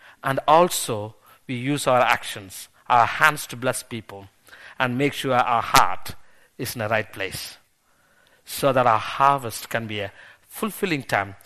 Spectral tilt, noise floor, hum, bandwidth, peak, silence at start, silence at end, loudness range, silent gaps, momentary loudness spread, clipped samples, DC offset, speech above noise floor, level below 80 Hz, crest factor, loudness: -4 dB/octave; -62 dBFS; none; 13.5 kHz; 0 dBFS; 0.25 s; 0.1 s; 3 LU; none; 17 LU; under 0.1%; under 0.1%; 40 dB; -54 dBFS; 24 dB; -22 LUFS